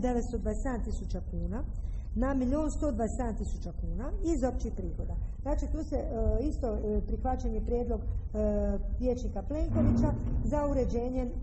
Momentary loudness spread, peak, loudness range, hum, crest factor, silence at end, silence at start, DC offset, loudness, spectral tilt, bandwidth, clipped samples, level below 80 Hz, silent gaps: 8 LU; -14 dBFS; 3 LU; none; 16 dB; 0 s; 0 s; under 0.1%; -33 LUFS; -8.5 dB/octave; 8.4 kHz; under 0.1%; -34 dBFS; none